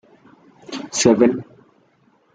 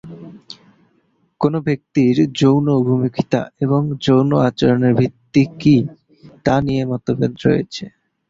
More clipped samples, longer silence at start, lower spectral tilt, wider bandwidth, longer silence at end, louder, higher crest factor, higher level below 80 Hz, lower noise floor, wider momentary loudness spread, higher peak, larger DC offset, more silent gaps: neither; first, 0.7 s vs 0.05 s; second, -4 dB/octave vs -7.5 dB/octave; first, 9.4 kHz vs 7.6 kHz; first, 0.9 s vs 0.4 s; about the same, -17 LUFS vs -17 LUFS; about the same, 20 dB vs 16 dB; second, -58 dBFS vs -48 dBFS; about the same, -59 dBFS vs -61 dBFS; first, 18 LU vs 14 LU; about the same, 0 dBFS vs -2 dBFS; neither; neither